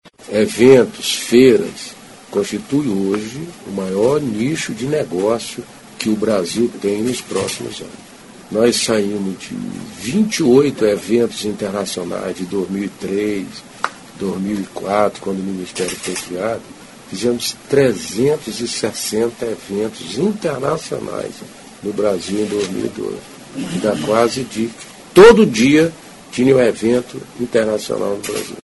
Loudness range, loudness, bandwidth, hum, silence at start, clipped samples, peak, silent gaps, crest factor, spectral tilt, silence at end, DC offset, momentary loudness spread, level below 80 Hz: 9 LU; -17 LUFS; 12 kHz; none; 0.05 s; under 0.1%; 0 dBFS; none; 18 dB; -5 dB/octave; 0.05 s; under 0.1%; 15 LU; -48 dBFS